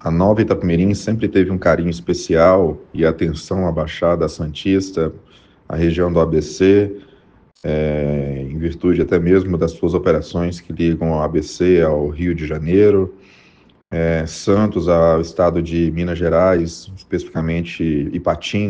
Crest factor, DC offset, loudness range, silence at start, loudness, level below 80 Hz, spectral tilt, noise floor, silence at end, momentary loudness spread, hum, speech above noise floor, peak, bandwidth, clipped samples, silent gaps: 16 dB; under 0.1%; 2 LU; 0.05 s; -17 LUFS; -38 dBFS; -7 dB/octave; -51 dBFS; 0 s; 9 LU; none; 34 dB; 0 dBFS; 9.2 kHz; under 0.1%; none